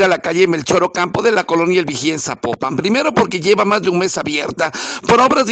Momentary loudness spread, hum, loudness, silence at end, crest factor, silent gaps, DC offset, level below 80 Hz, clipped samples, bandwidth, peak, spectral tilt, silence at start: 7 LU; none; -15 LUFS; 0 s; 14 dB; none; under 0.1%; -52 dBFS; under 0.1%; 9.2 kHz; 0 dBFS; -4 dB/octave; 0 s